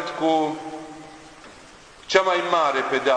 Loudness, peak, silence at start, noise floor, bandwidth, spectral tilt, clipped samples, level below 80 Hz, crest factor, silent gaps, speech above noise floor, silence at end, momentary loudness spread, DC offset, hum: -21 LUFS; -2 dBFS; 0 s; -46 dBFS; 10.5 kHz; -3.5 dB/octave; under 0.1%; -62 dBFS; 20 dB; none; 26 dB; 0 s; 23 LU; under 0.1%; none